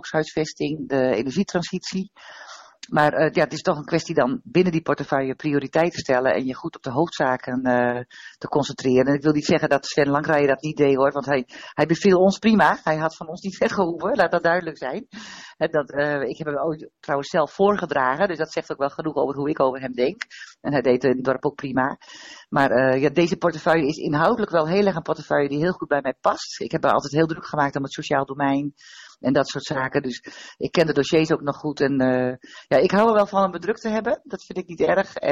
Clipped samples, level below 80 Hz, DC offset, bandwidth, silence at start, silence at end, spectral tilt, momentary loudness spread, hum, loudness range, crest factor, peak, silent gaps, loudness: under 0.1%; -58 dBFS; under 0.1%; 9 kHz; 0.05 s; 0 s; -6 dB/octave; 12 LU; none; 4 LU; 16 dB; -6 dBFS; none; -22 LUFS